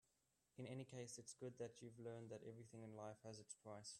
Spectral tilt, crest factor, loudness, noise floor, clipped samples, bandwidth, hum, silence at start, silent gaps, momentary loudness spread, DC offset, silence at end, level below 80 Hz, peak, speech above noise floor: -5 dB/octave; 16 dB; -57 LUFS; -87 dBFS; under 0.1%; 12.5 kHz; none; 0.55 s; none; 5 LU; under 0.1%; 0 s; -88 dBFS; -42 dBFS; 30 dB